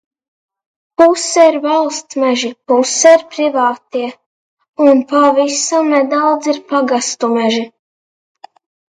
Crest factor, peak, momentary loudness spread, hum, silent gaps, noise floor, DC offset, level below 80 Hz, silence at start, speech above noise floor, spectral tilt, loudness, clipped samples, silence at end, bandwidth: 14 dB; 0 dBFS; 10 LU; none; 4.26-4.57 s, 4.69-4.73 s; under -90 dBFS; under 0.1%; -66 dBFS; 1 s; over 78 dB; -2 dB/octave; -13 LUFS; under 0.1%; 1.25 s; 9.6 kHz